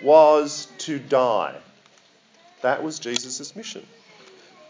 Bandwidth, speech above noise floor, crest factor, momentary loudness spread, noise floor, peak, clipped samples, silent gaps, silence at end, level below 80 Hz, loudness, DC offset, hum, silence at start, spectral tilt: 7.6 kHz; 36 dB; 20 dB; 20 LU; -56 dBFS; -2 dBFS; under 0.1%; none; 0.9 s; -76 dBFS; -22 LUFS; under 0.1%; none; 0 s; -3.5 dB/octave